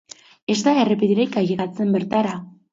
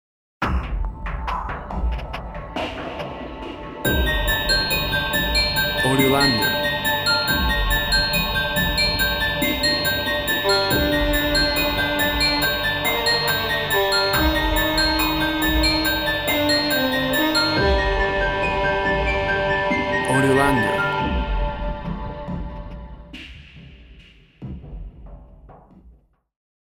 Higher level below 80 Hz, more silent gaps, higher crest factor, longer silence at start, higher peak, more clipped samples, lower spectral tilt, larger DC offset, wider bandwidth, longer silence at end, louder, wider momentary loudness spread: second, -62 dBFS vs -30 dBFS; neither; about the same, 16 dB vs 18 dB; about the same, 0.5 s vs 0.4 s; about the same, -4 dBFS vs -4 dBFS; neither; first, -6 dB/octave vs -4 dB/octave; neither; second, 7.8 kHz vs over 20 kHz; second, 0.25 s vs 0.85 s; about the same, -20 LUFS vs -20 LUFS; second, 8 LU vs 13 LU